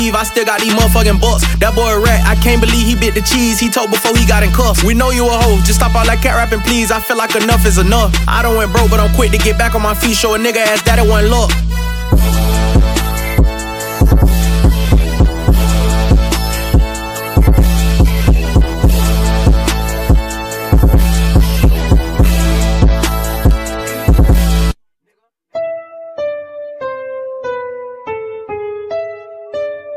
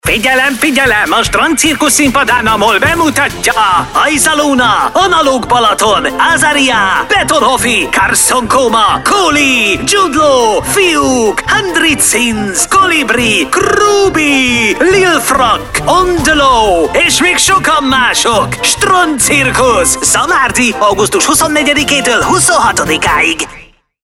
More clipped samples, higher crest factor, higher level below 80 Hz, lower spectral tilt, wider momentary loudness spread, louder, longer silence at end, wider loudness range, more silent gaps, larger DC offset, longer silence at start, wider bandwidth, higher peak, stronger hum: neither; about the same, 10 dB vs 10 dB; first, -14 dBFS vs -32 dBFS; first, -5 dB/octave vs -2 dB/octave; first, 12 LU vs 3 LU; second, -12 LUFS vs -8 LUFS; second, 0 s vs 0.4 s; first, 7 LU vs 1 LU; neither; neither; about the same, 0 s vs 0.05 s; about the same, 17.5 kHz vs 16.5 kHz; about the same, 0 dBFS vs 0 dBFS; neither